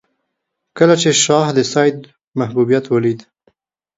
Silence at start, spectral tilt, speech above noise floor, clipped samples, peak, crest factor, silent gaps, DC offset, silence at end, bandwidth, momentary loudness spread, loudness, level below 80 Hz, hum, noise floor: 0.75 s; -4 dB/octave; 61 dB; under 0.1%; 0 dBFS; 16 dB; 2.28-2.32 s; under 0.1%; 0.75 s; 8 kHz; 12 LU; -14 LUFS; -60 dBFS; none; -75 dBFS